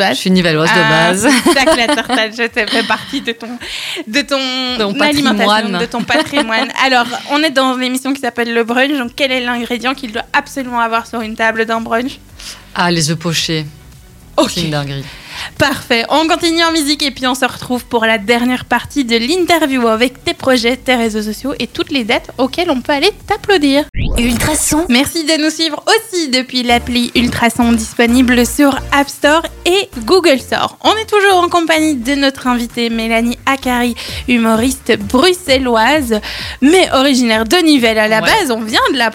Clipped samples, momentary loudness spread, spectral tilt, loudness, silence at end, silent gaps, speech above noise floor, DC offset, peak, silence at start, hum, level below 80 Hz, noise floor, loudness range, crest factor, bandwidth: under 0.1%; 8 LU; -3.5 dB/octave; -13 LUFS; 0 s; 23.89-23.93 s; 25 dB; under 0.1%; 0 dBFS; 0 s; none; -34 dBFS; -38 dBFS; 5 LU; 12 dB; 18 kHz